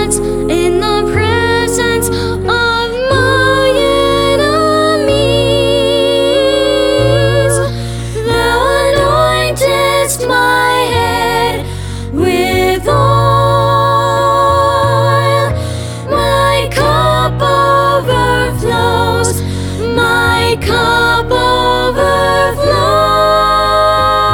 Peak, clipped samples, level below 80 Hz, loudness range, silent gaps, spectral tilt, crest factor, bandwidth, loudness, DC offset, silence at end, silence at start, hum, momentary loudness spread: 0 dBFS; under 0.1%; -28 dBFS; 2 LU; none; -4.5 dB/octave; 10 dB; 18.5 kHz; -11 LUFS; under 0.1%; 0 s; 0 s; none; 5 LU